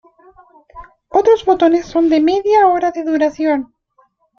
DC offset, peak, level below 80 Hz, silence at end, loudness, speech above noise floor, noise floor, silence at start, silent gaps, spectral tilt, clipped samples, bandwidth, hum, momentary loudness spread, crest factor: under 0.1%; -2 dBFS; -50 dBFS; 0.75 s; -14 LUFS; 44 dB; -57 dBFS; 0.75 s; none; -5 dB/octave; under 0.1%; 6.8 kHz; none; 6 LU; 14 dB